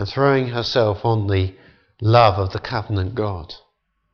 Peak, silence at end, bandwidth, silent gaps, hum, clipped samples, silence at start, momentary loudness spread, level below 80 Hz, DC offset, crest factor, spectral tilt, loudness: -2 dBFS; 0.55 s; 6.6 kHz; none; none; under 0.1%; 0 s; 13 LU; -46 dBFS; under 0.1%; 18 dB; -7.5 dB/octave; -19 LUFS